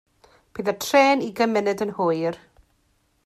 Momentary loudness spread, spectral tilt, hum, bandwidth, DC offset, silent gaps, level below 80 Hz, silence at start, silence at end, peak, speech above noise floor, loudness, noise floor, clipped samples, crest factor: 12 LU; -4.5 dB/octave; none; 15.5 kHz; under 0.1%; none; -64 dBFS; 0.55 s; 0.9 s; -6 dBFS; 45 dB; -22 LUFS; -66 dBFS; under 0.1%; 18 dB